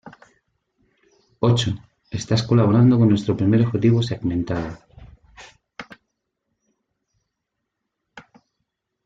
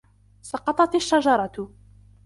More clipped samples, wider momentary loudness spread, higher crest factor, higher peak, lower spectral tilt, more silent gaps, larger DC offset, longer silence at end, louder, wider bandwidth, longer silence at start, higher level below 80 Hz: neither; first, 24 LU vs 16 LU; about the same, 18 dB vs 18 dB; about the same, -4 dBFS vs -6 dBFS; first, -7 dB/octave vs -4 dB/octave; neither; neither; first, 0.85 s vs 0.6 s; first, -19 LUFS vs -22 LUFS; second, 7.8 kHz vs 11.5 kHz; second, 0.05 s vs 0.45 s; about the same, -52 dBFS vs -56 dBFS